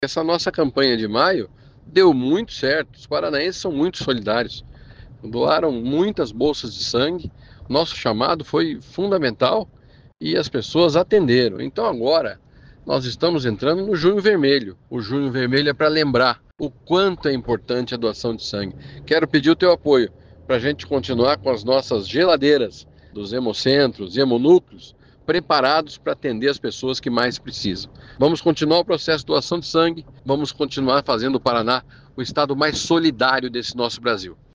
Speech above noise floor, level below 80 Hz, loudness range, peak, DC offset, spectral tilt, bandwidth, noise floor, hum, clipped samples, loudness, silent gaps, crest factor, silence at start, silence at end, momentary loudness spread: 23 dB; -50 dBFS; 3 LU; -2 dBFS; under 0.1%; -5.5 dB/octave; 7.8 kHz; -42 dBFS; none; under 0.1%; -20 LUFS; none; 18 dB; 0 s; 0.2 s; 10 LU